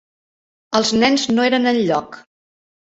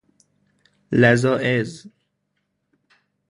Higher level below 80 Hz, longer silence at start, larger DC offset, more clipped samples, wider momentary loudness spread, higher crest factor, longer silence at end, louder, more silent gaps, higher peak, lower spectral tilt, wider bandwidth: about the same, -56 dBFS vs -56 dBFS; second, 0.7 s vs 0.9 s; neither; neither; about the same, 6 LU vs 8 LU; about the same, 18 dB vs 22 dB; second, 0.8 s vs 1.4 s; about the same, -17 LUFS vs -19 LUFS; neither; about the same, -2 dBFS vs 0 dBFS; second, -3.5 dB/octave vs -6.5 dB/octave; second, 8.2 kHz vs 11 kHz